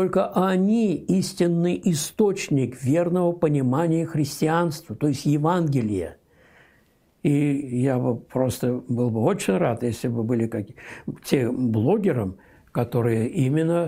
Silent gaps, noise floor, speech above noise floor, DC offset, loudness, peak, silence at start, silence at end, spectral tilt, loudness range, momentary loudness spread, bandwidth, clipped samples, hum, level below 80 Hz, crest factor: none; -61 dBFS; 39 dB; under 0.1%; -23 LUFS; -4 dBFS; 0 s; 0 s; -7 dB/octave; 3 LU; 6 LU; 16 kHz; under 0.1%; none; -58 dBFS; 18 dB